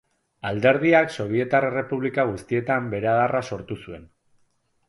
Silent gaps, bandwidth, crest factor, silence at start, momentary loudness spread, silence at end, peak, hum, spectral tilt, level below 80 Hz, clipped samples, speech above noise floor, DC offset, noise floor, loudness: none; 11.5 kHz; 20 dB; 0.45 s; 15 LU; 0.85 s; -4 dBFS; none; -7 dB/octave; -56 dBFS; under 0.1%; 44 dB; under 0.1%; -66 dBFS; -22 LUFS